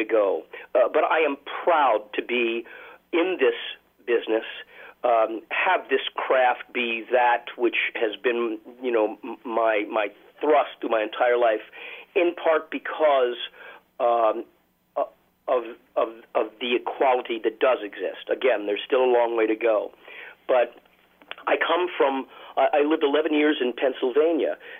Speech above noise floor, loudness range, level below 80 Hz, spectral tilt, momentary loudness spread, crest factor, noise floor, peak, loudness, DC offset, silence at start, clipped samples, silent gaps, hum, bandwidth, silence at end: 22 dB; 3 LU; -76 dBFS; -5.5 dB/octave; 11 LU; 14 dB; -45 dBFS; -10 dBFS; -24 LUFS; under 0.1%; 0 s; under 0.1%; none; none; 15.5 kHz; 0 s